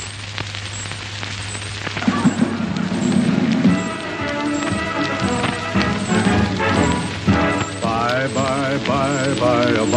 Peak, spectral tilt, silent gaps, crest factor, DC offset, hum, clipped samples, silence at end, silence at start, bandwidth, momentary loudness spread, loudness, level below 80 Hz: 0 dBFS; -5 dB/octave; none; 18 dB; under 0.1%; none; under 0.1%; 0 s; 0 s; 10 kHz; 10 LU; -19 LUFS; -40 dBFS